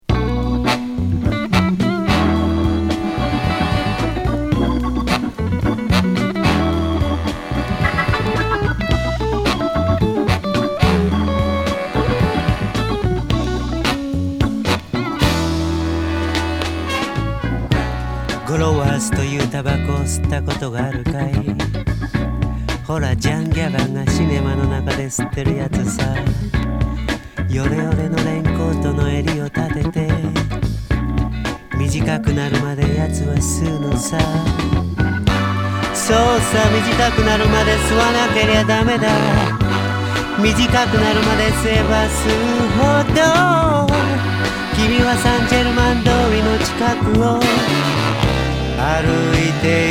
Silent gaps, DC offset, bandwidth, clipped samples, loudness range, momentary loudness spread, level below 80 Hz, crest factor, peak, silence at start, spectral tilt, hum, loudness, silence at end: none; under 0.1%; 17.5 kHz; under 0.1%; 5 LU; 7 LU; -26 dBFS; 16 dB; 0 dBFS; 0.1 s; -5.5 dB/octave; none; -17 LUFS; 0 s